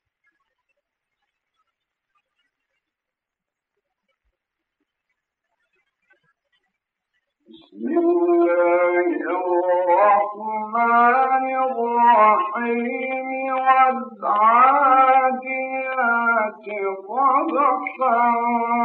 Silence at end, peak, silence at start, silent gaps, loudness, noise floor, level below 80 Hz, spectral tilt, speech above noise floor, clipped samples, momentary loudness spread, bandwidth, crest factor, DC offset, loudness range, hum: 0 s; -4 dBFS; 7.75 s; none; -18 LUFS; -86 dBFS; -80 dBFS; -8.5 dB/octave; 66 dB; under 0.1%; 11 LU; 4.3 kHz; 16 dB; under 0.1%; 5 LU; none